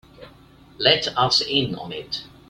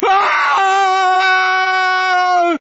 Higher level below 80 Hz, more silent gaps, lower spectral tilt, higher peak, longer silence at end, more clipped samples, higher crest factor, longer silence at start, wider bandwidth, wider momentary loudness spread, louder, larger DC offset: first, -54 dBFS vs -64 dBFS; neither; first, -3.5 dB/octave vs 3 dB/octave; about the same, 0 dBFS vs 0 dBFS; first, 0.2 s vs 0.05 s; neither; first, 24 dB vs 12 dB; first, 0.2 s vs 0 s; first, 15.5 kHz vs 8 kHz; first, 13 LU vs 2 LU; second, -20 LUFS vs -13 LUFS; neither